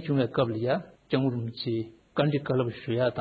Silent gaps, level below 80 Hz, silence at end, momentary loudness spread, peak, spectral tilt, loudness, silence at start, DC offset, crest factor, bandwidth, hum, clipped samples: none; -62 dBFS; 0 s; 6 LU; -12 dBFS; -9.5 dB/octave; -29 LUFS; 0 s; under 0.1%; 16 dB; 5 kHz; none; under 0.1%